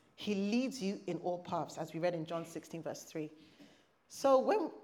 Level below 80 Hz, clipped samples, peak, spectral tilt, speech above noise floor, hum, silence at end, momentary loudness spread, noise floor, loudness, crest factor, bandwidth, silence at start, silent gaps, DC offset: -84 dBFS; under 0.1%; -16 dBFS; -5.5 dB/octave; 27 dB; none; 0 s; 15 LU; -63 dBFS; -36 LUFS; 20 dB; 16 kHz; 0.2 s; none; under 0.1%